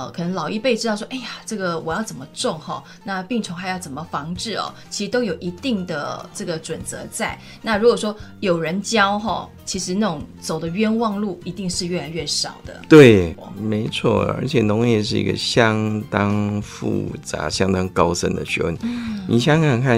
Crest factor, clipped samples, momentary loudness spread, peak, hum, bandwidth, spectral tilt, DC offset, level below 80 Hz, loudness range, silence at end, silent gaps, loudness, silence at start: 20 dB; under 0.1%; 11 LU; 0 dBFS; none; 15.5 kHz; -5 dB/octave; under 0.1%; -46 dBFS; 10 LU; 0 s; none; -20 LUFS; 0 s